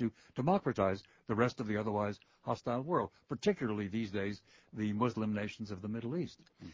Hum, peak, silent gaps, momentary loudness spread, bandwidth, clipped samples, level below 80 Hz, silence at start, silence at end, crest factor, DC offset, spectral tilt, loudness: none; -16 dBFS; none; 9 LU; 7.6 kHz; under 0.1%; -64 dBFS; 0 s; 0 s; 20 dB; under 0.1%; -7 dB/octave; -36 LUFS